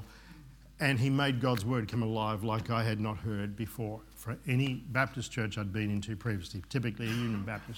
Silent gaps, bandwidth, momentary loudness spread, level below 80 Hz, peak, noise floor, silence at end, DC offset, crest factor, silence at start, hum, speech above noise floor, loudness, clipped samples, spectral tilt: none; 18 kHz; 10 LU; -56 dBFS; -12 dBFS; -53 dBFS; 0 s; under 0.1%; 20 dB; 0 s; none; 20 dB; -33 LUFS; under 0.1%; -6 dB/octave